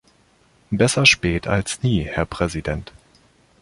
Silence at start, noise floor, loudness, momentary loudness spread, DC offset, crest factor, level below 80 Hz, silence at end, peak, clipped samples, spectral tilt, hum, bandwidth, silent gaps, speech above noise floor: 0.7 s; -57 dBFS; -19 LUFS; 14 LU; under 0.1%; 22 dB; -38 dBFS; 0.8 s; 0 dBFS; under 0.1%; -4 dB/octave; none; 11.5 kHz; none; 38 dB